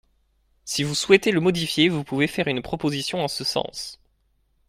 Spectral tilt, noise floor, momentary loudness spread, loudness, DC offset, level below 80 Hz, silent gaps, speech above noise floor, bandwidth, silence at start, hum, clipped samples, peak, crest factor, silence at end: -4.5 dB/octave; -66 dBFS; 12 LU; -22 LUFS; under 0.1%; -56 dBFS; none; 44 dB; 16 kHz; 0.65 s; none; under 0.1%; 0 dBFS; 24 dB; 0.75 s